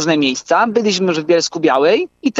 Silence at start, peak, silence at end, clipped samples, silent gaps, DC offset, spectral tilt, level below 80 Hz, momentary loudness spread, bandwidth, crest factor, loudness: 0 s; -2 dBFS; 0 s; under 0.1%; none; under 0.1%; -4 dB/octave; -64 dBFS; 3 LU; 8 kHz; 12 dB; -15 LUFS